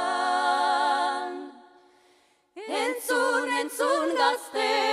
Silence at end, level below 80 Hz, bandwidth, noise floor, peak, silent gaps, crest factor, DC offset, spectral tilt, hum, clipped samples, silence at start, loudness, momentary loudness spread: 0 s; -84 dBFS; 15.5 kHz; -63 dBFS; -10 dBFS; none; 16 dB; under 0.1%; 0 dB/octave; none; under 0.1%; 0 s; -25 LUFS; 10 LU